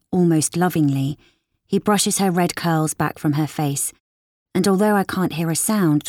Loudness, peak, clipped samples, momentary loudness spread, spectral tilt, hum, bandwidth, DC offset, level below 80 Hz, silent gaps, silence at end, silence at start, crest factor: -20 LUFS; -6 dBFS; under 0.1%; 7 LU; -5 dB/octave; none; 18 kHz; under 0.1%; -58 dBFS; 4.00-4.46 s; 0 s; 0.1 s; 14 dB